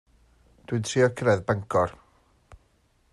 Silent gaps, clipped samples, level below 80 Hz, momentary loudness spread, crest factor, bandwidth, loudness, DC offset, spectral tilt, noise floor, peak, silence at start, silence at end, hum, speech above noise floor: none; under 0.1%; -58 dBFS; 8 LU; 18 dB; 12 kHz; -25 LUFS; under 0.1%; -5.5 dB/octave; -65 dBFS; -10 dBFS; 0.7 s; 1.2 s; none; 41 dB